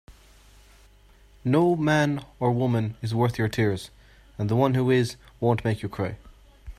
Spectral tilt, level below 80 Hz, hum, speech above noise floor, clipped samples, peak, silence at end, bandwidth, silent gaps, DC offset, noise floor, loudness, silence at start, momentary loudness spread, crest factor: -7 dB/octave; -52 dBFS; none; 30 dB; under 0.1%; -8 dBFS; 0.05 s; 14.5 kHz; none; under 0.1%; -54 dBFS; -25 LUFS; 0.1 s; 11 LU; 18 dB